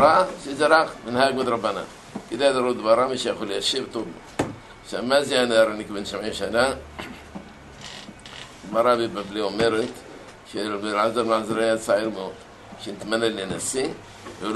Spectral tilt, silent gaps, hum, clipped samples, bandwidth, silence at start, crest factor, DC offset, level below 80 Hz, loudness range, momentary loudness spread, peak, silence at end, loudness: -3.5 dB/octave; none; none; under 0.1%; 12 kHz; 0 s; 22 dB; under 0.1%; -54 dBFS; 4 LU; 19 LU; -2 dBFS; 0 s; -23 LUFS